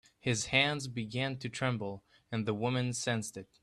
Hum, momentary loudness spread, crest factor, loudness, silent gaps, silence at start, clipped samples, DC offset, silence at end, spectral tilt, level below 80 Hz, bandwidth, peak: none; 12 LU; 22 dB; -33 LUFS; none; 0.25 s; under 0.1%; under 0.1%; 0.2 s; -4 dB/octave; -66 dBFS; 13 kHz; -12 dBFS